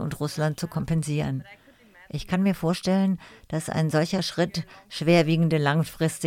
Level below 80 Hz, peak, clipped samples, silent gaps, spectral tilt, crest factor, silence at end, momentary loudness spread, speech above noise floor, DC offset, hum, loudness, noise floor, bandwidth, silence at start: -52 dBFS; -8 dBFS; under 0.1%; none; -6 dB/octave; 18 dB; 0 s; 12 LU; 29 dB; under 0.1%; none; -25 LUFS; -53 dBFS; 16 kHz; 0 s